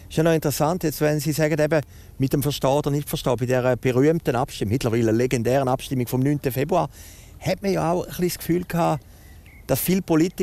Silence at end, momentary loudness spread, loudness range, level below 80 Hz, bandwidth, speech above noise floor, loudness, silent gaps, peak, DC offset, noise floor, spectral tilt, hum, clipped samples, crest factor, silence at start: 0 s; 6 LU; 3 LU; -46 dBFS; 16 kHz; 23 dB; -22 LUFS; none; -6 dBFS; under 0.1%; -45 dBFS; -6 dB/octave; none; under 0.1%; 16 dB; 0 s